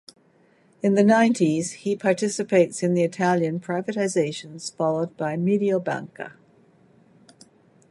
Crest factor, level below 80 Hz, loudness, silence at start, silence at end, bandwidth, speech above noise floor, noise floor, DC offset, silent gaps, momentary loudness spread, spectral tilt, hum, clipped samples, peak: 18 dB; -72 dBFS; -23 LUFS; 0.85 s; 1.6 s; 11.5 kHz; 37 dB; -59 dBFS; under 0.1%; none; 12 LU; -6 dB/octave; none; under 0.1%; -6 dBFS